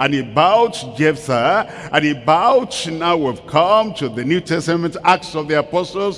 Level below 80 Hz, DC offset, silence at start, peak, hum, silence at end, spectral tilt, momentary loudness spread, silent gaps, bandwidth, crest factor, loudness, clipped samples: -52 dBFS; under 0.1%; 0 s; 0 dBFS; none; 0 s; -5 dB/octave; 6 LU; none; 12 kHz; 16 dB; -17 LUFS; under 0.1%